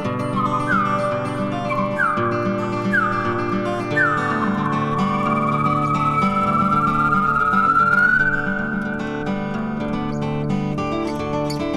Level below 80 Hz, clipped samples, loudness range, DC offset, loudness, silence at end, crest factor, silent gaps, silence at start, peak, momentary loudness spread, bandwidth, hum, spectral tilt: -42 dBFS; under 0.1%; 4 LU; under 0.1%; -20 LUFS; 0 s; 14 dB; none; 0 s; -6 dBFS; 8 LU; 12.5 kHz; none; -7 dB/octave